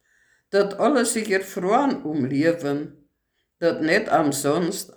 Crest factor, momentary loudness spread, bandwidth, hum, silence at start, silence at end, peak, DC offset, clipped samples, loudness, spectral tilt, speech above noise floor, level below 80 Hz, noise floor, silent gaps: 16 dB; 6 LU; over 20 kHz; none; 0.55 s; 0.1 s; -6 dBFS; under 0.1%; under 0.1%; -22 LUFS; -4.5 dB/octave; 53 dB; -66 dBFS; -74 dBFS; none